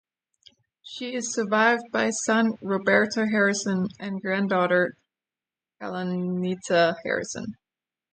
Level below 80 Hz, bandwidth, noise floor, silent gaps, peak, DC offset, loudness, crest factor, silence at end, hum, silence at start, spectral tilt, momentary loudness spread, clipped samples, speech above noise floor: -70 dBFS; 9.4 kHz; under -90 dBFS; none; -6 dBFS; under 0.1%; -24 LUFS; 18 dB; 0.6 s; none; 0.85 s; -4.5 dB/octave; 12 LU; under 0.1%; over 66 dB